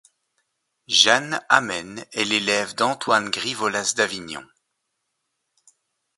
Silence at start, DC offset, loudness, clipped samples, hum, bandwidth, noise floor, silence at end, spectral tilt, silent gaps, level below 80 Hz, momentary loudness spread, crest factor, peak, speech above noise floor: 0.9 s; under 0.1%; -20 LUFS; under 0.1%; none; 12 kHz; -77 dBFS; 1.75 s; -1.5 dB/octave; none; -66 dBFS; 14 LU; 24 dB; 0 dBFS; 55 dB